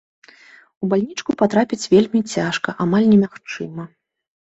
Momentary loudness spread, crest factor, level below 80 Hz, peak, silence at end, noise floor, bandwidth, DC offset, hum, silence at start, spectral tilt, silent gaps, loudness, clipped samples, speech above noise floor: 15 LU; 16 dB; -58 dBFS; -2 dBFS; 0.55 s; -48 dBFS; 8 kHz; under 0.1%; none; 0.8 s; -6 dB/octave; none; -18 LUFS; under 0.1%; 30 dB